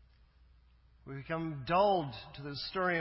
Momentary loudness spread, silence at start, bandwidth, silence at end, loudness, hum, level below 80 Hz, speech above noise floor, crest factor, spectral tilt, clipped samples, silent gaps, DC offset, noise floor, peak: 17 LU; 1.05 s; 5.8 kHz; 0 s; -34 LUFS; none; -60 dBFS; 30 dB; 18 dB; -9 dB/octave; under 0.1%; none; under 0.1%; -63 dBFS; -16 dBFS